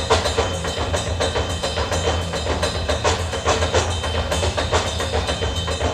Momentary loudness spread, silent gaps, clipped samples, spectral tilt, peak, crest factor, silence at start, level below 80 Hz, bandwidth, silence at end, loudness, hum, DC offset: 4 LU; none; under 0.1%; -4 dB/octave; -4 dBFS; 18 dB; 0 s; -30 dBFS; 14 kHz; 0 s; -21 LUFS; none; under 0.1%